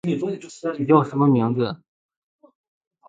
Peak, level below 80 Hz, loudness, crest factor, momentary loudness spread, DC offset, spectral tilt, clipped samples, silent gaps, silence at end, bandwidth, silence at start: -2 dBFS; -64 dBFS; -21 LUFS; 22 dB; 11 LU; under 0.1%; -8 dB/octave; under 0.1%; none; 1.3 s; 9 kHz; 0.05 s